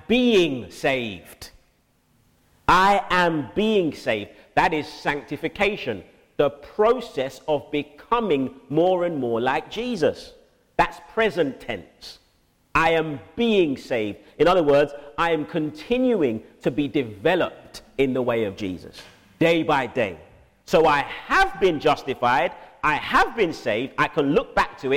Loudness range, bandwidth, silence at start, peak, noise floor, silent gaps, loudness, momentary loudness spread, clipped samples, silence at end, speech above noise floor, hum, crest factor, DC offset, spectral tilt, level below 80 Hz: 3 LU; 16.5 kHz; 0.1 s; -6 dBFS; -63 dBFS; none; -22 LUFS; 12 LU; under 0.1%; 0 s; 41 dB; none; 18 dB; under 0.1%; -5.5 dB/octave; -46 dBFS